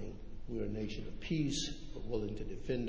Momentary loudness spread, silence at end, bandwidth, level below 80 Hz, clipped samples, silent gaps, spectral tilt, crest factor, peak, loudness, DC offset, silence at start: 11 LU; 0 s; 8 kHz; -48 dBFS; under 0.1%; none; -5 dB/octave; 14 dB; -24 dBFS; -40 LUFS; under 0.1%; 0 s